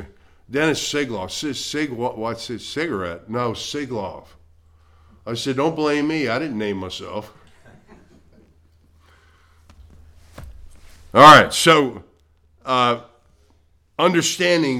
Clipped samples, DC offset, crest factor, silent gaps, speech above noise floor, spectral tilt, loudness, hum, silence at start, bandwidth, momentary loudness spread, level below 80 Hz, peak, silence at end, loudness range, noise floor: under 0.1%; under 0.1%; 20 dB; none; 39 dB; -4 dB/octave; -18 LUFS; none; 0 s; 16.5 kHz; 18 LU; -50 dBFS; 0 dBFS; 0 s; 13 LU; -58 dBFS